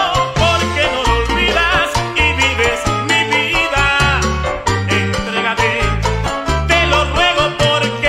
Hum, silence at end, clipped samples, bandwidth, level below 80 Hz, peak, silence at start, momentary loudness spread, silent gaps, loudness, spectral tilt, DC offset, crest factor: none; 0 s; under 0.1%; 16 kHz; -24 dBFS; 0 dBFS; 0 s; 5 LU; none; -14 LUFS; -4 dB/octave; under 0.1%; 14 dB